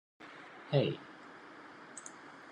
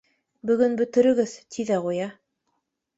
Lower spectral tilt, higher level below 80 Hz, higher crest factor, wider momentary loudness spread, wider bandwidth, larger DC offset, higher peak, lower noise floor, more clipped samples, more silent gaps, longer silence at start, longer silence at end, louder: about the same, -6 dB/octave vs -6 dB/octave; second, -82 dBFS vs -68 dBFS; first, 24 dB vs 18 dB; first, 19 LU vs 12 LU; first, 10.5 kHz vs 8 kHz; neither; second, -16 dBFS vs -6 dBFS; second, -53 dBFS vs -76 dBFS; neither; neither; second, 0.2 s vs 0.45 s; second, 0 s vs 0.85 s; second, -36 LUFS vs -23 LUFS